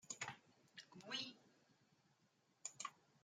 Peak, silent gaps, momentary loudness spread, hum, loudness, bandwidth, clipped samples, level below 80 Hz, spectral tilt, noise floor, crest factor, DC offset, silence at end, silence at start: -32 dBFS; none; 15 LU; none; -52 LUFS; 14 kHz; under 0.1%; under -90 dBFS; -1 dB/octave; -80 dBFS; 24 dB; under 0.1%; 0.05 s; 0.05 s